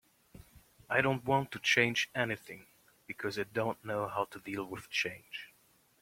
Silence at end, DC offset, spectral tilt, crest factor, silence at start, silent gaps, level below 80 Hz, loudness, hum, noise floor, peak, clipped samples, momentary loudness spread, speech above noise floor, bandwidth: 0.55 s; under 0.1%; -4 dB/octave; 24 dB; 0.35 s; none; -68 dBFS; -33 LUFS; none; -68 dBFS; -12 dBFS; under 0.1%; 18 LU; 34 dB; 16.5 kHz